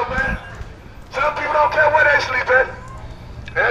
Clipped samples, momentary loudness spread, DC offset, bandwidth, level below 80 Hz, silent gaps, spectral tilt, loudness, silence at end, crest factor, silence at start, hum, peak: under 0.1%; 22 LU; under 0.1%; 13 kHz; -36 dBFS; none; -4.5 dB/octave; -17 LUFS; 0 s; 18 dB; 0 s; none; -2 dBFS